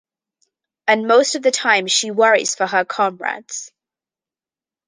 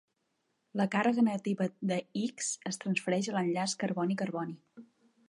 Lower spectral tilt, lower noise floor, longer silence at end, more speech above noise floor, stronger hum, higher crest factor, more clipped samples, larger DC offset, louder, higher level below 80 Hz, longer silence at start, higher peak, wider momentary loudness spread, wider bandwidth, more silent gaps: second, -1.5 dB/octave vs -5 dB/octave; first, under -90 dBFS vs -79 dBFS; first, 1.2 s vs 0.45 s; first, over 73 dB vs 47 dB; neither; about the same, 18 dB vs 18 dB; neither; neither; first, -17 LUFS vs -32 LUFS; first, -74 dBFS vs -82 dBFS; about the same, 0.85 s vs 0.75 s; first, -2 dBFS vs -14 dBFS; first, 12 LU vs 8 LU; second, 10 kHz vs 11.5 kHz; neither